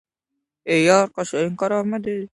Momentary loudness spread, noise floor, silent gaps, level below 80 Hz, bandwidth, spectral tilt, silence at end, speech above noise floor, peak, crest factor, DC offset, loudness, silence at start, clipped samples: 10 LU; -80 dBFS; none; -64 dBFS; 11.5 kHz; -5 dB/octave; 0.05 s; 61 dB; -2 dBFS; 18 dB; under 0.1%; -20 LUFS; 0.65 s; under 0.1%